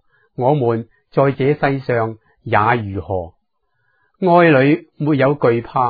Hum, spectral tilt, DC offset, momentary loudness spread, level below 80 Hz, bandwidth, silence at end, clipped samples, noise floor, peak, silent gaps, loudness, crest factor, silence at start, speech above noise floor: none; -11 dB/octave; under 0.1%; 13 LU; -52 dBFS; 4.9 kHz; 0 s; under 0.1%; -69 dBFS; 0 dBFS; none; -17 LUFS; 16 dB; 0.4 s; 54 dB